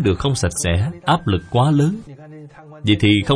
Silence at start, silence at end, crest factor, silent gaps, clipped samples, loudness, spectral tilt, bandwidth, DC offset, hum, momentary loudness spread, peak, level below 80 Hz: 0 s; 0 s; 16 dB; none; under 0.1%; -18 LUFS; -5.5 dB/octave; 10.5 kHz; under 0.1%; none; 18 LU; -2 dBFS; -38 dBFS